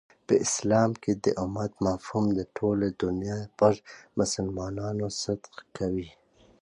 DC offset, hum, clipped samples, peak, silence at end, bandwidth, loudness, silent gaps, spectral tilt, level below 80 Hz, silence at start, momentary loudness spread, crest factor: under 0.1%; none; under 0.1%; -8 dBFS; 0.5 s; 11 kHz; -28 LUFS; none; -5.5 dB/octave; -52 dBFS; 0.3 s; 10 LU; 20 dB